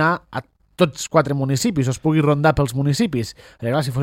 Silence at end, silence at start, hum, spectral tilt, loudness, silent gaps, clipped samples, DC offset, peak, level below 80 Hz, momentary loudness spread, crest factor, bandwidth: 0 s; 0 s; none; -6 dB/octave; -20 LUFS; none; under 0.1%; under 0.1%; 0 dBFS; -44 dBFS; 11 LU; 18 dB; 16.5 kHz